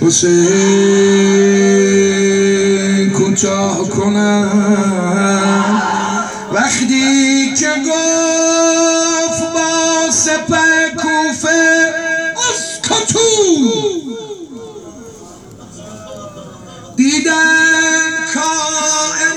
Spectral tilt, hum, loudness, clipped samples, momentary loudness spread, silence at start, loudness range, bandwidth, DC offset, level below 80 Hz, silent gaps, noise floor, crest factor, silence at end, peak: -3 dB/octave; none; -12 LUFS; under 0.1%; 9 LU; 0 s; 5 LU; 12 kHz; under 0.1%; -52 dBFS; none; -35 dBFS; 12 dB; 0 s; 0 dBFS